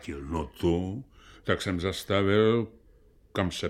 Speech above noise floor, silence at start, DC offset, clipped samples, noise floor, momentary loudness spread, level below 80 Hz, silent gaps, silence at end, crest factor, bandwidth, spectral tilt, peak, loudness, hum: 31 dB; 0 s; under 0.1%; under 0.1%; -58 dBFS; 14 LU; -48 dBFS; none; 0 s; 20 dB; 16.5 kHz; -6 dB/octave; -8 dBFS; -28 LUFS; none